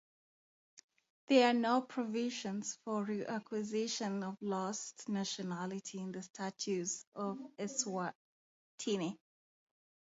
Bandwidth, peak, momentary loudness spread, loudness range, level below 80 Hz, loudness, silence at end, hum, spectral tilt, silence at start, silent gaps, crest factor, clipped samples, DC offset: 7.6 kHz; -16 dBFS; 12 LU; 6 LU; -86 dBFS; -38 LUFS; 0.95 s; none; -4 dB/octave; 0.75 s; 0.84-0.89 s, 1.10-1.28 s, 6.30-6.34 s, 7.07-7.12 s, 8.15-8.78 s; 22 dB; under 0.1%; under 0.1%